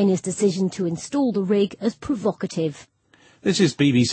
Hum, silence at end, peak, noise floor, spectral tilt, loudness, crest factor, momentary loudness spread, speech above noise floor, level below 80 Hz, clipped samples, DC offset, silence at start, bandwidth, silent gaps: none; 0 s; -6 dBFS; -56 dBFS; -5.5 dB/octave; -22 LUFS; 16 dB; 8 LU; 35 dB; -58 dBFS; under 0.1%; under 0.1%; 0 s; 8.8 kHz; none